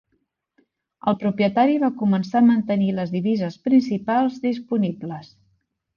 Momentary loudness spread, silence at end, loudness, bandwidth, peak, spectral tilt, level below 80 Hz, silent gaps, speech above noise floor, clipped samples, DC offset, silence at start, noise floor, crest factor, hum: 9 LU; 0.7 s; -21 LUFS; 7 kHz; -6 dBFS; -8.5 dB/octave; -62 dBFS; none; 52 dB; under 0.1%; under 0.1%; 1.05 s; -72 dBFS; 16 dB; none